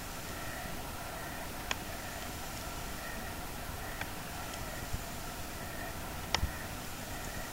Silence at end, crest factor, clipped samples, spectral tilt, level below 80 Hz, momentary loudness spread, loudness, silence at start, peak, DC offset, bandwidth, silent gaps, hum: 0 s; 30 dB; under 0.1%; -3 dB/octave; -48 dBFS; 5 LU; -40 LUFS; 0 s; -10 dBFS; under 0.1%; 16 kHz; none; none